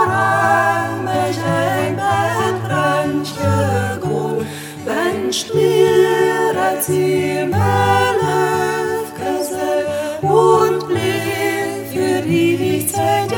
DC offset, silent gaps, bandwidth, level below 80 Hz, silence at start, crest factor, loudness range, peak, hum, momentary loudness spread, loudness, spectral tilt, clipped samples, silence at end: under 0.1%; none; 19.5 kHz; -56 dBFS; 0 s; 16 dB; 3 LU; 0 dBFS; none; 7 LU; -17 LUFS; -5 dB/octave; under 0.1%; 0 s